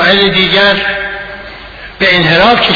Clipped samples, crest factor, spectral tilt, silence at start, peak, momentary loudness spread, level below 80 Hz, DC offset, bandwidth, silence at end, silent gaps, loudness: 0.4%; 10 dB; -5.5 dB/octave; 0 s; 0 dBFS; 20 LU; -36 dBFS; under 0.1%; 5.4 kHz; 0 s; none; -8 LUFS